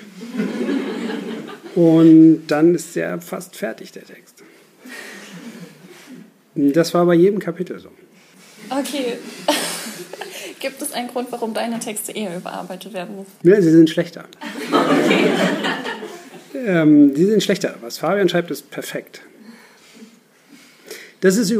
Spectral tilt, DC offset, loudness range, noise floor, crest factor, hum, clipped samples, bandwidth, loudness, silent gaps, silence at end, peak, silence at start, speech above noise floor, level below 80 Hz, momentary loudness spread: -5.5 dB/octave; under 0.1%; 10 LU; -49 dBFS; 16 dB; none; under 0.1%; 15.5 kHz; -17 LUFS; none; 0 s; -2 dBFS; 0 s; 32 dB; -74 dBFS; 21 LU